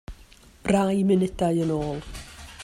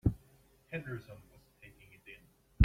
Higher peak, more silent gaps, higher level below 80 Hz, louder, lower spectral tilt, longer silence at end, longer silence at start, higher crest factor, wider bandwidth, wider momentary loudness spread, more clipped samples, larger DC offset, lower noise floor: about the same, -8 dBFS vs -8 dBFS; neither; about the same, -44 dBFS vs -42 dBFS; first, -24 LUFS vs -44 LUFS; second, -7 dB/octave vs -9 dB/octave; about the same, 0 s vs 0 s; about the same, 0.1 s vs 0.05 s; second, 16 dB vs 28 dB; second, 13 kHz vs 15.5 kHz; about the same, 19 LU vs 21 LU; neither; neither; second, -51 dBFS vs -65 dBFS